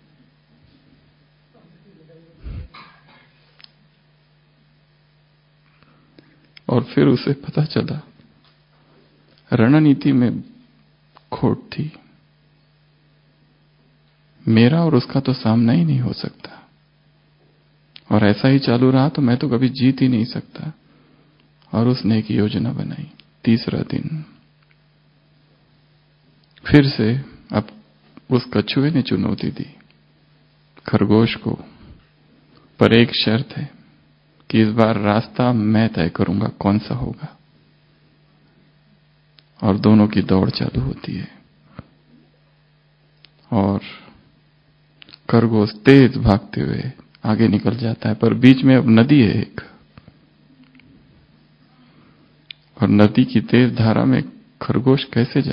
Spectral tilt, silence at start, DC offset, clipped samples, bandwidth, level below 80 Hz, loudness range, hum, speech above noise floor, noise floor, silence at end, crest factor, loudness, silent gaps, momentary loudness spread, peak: -9.5 dB/octave; 2.45 s; under 0.1%; under 0.1%; 5.4 kHz; -46 dBFS; 10 LU; none; 40 dB; -57 dBFS; 0 s; 20 dB; -17 LUFS; none; 18 LU; 0 dBFS